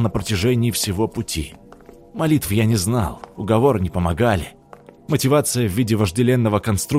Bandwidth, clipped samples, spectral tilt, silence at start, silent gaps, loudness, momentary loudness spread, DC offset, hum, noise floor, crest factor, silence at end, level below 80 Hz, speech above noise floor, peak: 16 kHz; under 0.1%; -5.5 dB/octave; 0 s; none; -19 LUFS; 9 LU; under 0.1%; none; -45 dBFS; 16 dB; 0 s; -42 dBFS; 26 dB; -4 dBFS